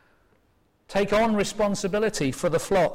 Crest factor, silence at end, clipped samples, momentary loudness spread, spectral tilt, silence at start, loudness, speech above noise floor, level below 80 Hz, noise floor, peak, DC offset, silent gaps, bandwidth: 10 dB; 0 s; under 0.1%; 4 LU; -5 dB/octave; 0.9 s; -24 LUFS; 42 dB; -48 dBFS; -65 dBFS; -14 dBFS; under 0.1%; none; 16.5 kHz